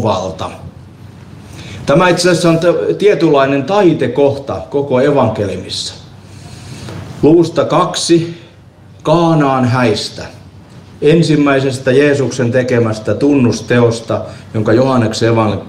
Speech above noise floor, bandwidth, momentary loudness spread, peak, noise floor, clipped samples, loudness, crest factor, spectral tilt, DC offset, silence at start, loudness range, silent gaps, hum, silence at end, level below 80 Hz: 27 dB; 12.5 kHz; 16 LU; 0 dBFS; -39 dBFS; under 0.1%; -12 LUFS; 12 dB; -6 dB/octave; under 0.1%; 0 s; 3 LU; none; none; 0 s; -44 dBFS